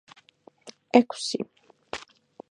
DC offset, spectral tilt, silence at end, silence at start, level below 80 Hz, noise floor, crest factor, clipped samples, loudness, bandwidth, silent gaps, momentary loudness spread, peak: under 0.1%; -4 dB/octave; 0.55 s; 0.65 s; -70 dBFS; -57 dBFS; 28 dB; under 0.1%; -24 LUFS; 11 kHz; none; 23 LU; -2 dBFS